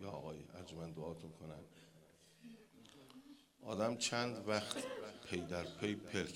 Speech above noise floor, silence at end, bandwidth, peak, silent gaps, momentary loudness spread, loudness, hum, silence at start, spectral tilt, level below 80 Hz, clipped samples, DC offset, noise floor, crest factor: 24 dB; 0 s; 16 kHz; -20 dBFS; none; 23 LU; -43 LUFS; none; 0 s; -4 dB/octave; -72 dBFS; under 0.1%; under 0.1%; -67 dBFS; 24 dB